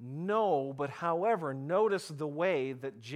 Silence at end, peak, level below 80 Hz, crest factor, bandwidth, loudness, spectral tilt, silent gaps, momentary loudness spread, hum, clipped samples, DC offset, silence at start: 0 s; -18 dBFS; -82 dBFS; 14 dB; 14 kHz; -32 LUFS; -6.5 dB/octave; none; 8 LU; none; under 0.1%; under 0.1%; 0 s